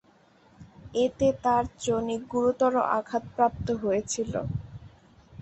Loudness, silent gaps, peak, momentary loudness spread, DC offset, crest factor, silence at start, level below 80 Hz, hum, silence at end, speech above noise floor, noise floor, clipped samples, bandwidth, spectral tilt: -27 LUFS; none; -8 dBFS; 10 LU; under 0.1%; 20 dB; 0.6 s; -50 dBFS; none; 0 s; 33 dB; -60 dBFS; under 0.1%; 8.4 kHz; -5.5 dB/octave